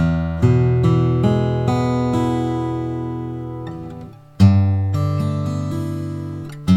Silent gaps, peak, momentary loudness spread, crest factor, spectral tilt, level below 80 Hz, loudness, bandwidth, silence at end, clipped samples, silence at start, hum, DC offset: none; -2 dBFS; 14 LU; 16 dB; -8.5 dB/octave; -38 dBFS; -19 LUFS; 10 kHz; 0 s; under 0.1%; 0 s; none; under 0.1%